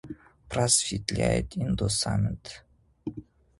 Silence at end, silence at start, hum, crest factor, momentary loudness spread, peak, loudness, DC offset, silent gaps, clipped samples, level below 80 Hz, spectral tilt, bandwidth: 0.4 s; 0.05 s; none; 22 dB; 23 LU; -8 dBFS; -26 LUFS; under 0.1%; none; under 0.1%; -44 dBFS; -4 dB/octave; 11.5 kHz